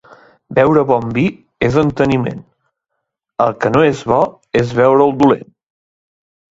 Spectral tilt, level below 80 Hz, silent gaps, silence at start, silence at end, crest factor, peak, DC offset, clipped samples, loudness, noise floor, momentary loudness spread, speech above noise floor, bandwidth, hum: -7.5 dB/octave; -44 dBFS; none; 0.5 s; 1.1 s; 16 dB; 0 dBFS; under 0.1%; under 0.1%; -14 LUFS; -75 dBFS; 8 LU; 62 dB; 7.8 kHz; none